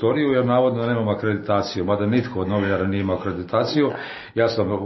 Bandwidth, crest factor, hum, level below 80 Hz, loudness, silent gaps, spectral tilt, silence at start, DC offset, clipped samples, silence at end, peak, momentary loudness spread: 6.2 kHz; 16 dB; none; -56 dBFS; -22 LUFS; none; -7.5 dB/octave; 0 s; under 0.1%; under 0.1%; 0 s; -6 dBFS; 5 LU